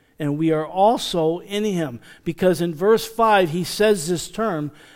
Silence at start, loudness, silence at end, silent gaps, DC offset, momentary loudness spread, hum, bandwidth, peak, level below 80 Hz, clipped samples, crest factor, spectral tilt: 0.2 s; -20 LUFS; 0.25 s; none; under 0.1%; 9 LU; none; 16.5 kHz; -4 dBFS; -50 dBFS; under 0.1%; 16 dB; -5 dB/octave